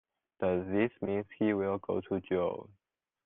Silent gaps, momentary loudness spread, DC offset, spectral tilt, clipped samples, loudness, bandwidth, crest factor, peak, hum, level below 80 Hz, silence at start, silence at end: none; 5 LU; under 0.1%; -6.5 dB/octave; under 0.1%; -33 LUFS; 3.9 kHz; 18 dB; -16 dBFS; none; -72 dBFS; 0.4 s; 0.6 s